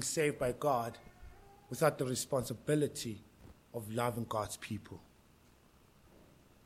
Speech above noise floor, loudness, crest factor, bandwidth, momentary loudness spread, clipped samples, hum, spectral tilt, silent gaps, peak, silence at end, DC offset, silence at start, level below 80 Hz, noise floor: 29 dB; -36 LUFS; 22 dB; 16.5 kHz; 17 LU; under 0.1%; none; -4.5 dB/octave; none; -16 dBFS; 1.65 s; under 0.1%; 0 s; -64 dBFS; -65 dBFS